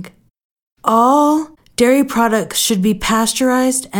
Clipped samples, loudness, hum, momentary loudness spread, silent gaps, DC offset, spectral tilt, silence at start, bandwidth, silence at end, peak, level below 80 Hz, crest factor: under 0.1%; -14 LUFS; none; 4 LU; 0.44-0.56 s, 0.62-0.76 s; under 0.1%; -3.5 dB/octave; 0 s; 19 kHz; 0 s; 0 dBFS; -44 dBFS; 14 dB